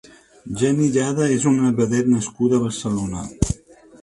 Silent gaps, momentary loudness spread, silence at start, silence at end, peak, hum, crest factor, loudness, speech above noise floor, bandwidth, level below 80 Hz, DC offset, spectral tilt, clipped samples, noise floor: none; 7 LU; 0.45 s; 0.5 s; -2 dBFS; none; 18 dB; -20 LUFS; 27 dB; 11.5 kHz; -40 dBFS; under 0.1%; -6 dB/octave; under 0.1%; -46 dBFS